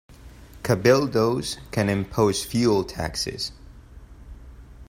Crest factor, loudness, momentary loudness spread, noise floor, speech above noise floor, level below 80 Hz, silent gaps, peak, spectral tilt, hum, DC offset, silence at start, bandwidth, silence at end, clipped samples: 20 dB; -23 LUFS; 10 LU; -45 dBFS; 22 dB; -46 dBFS; none; -4 dBFS; -5 dB/octave; none; under 0.1%; 0.1 s; 16 kHz; 0.05 s; under 0.1%